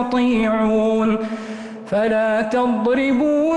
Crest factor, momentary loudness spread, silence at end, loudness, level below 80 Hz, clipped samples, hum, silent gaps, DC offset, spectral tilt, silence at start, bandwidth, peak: 8 dB; 9 LU; 0 s; -18 LUFS; -48 dBFS; under 0.1%; none; none; under 0.1%; -6.5 dB/octave; 0 s; 9.6 kHz; -10 dBFS